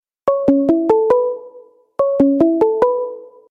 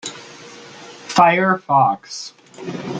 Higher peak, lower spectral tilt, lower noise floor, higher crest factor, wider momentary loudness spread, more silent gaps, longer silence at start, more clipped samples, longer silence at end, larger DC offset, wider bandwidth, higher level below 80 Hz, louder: about the same, -2 dBFS vs -2 dBFS; first, -9 dB/octave vs -4.5 dB/octave; first, -44 dBFS vs -39 dBFS; about the same, 14 dB vs 18 dB; second, 14 LU vs 24 LU; neither; first, 0.25 s vs 0.05 s; neither; first, 0.2 s vs 0 s; neither; second, 5.4 kHz vs 9.4 kHz; first, -52 dBFS vs -64 dBFS; about the same, -16 LUFS vs -16 LUFS